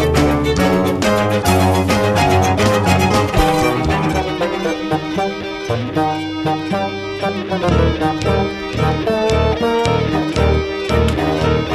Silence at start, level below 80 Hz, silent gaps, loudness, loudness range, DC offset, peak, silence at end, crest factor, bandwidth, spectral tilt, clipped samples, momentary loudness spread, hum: 0 s; -28 dBFS; none; -16 LUFS; 5 LU; under 0.1%; -2 dBFS; 0 s; 14 dB; 14 kHz; -6 dB/octave; under 0.1%; 7 LU; none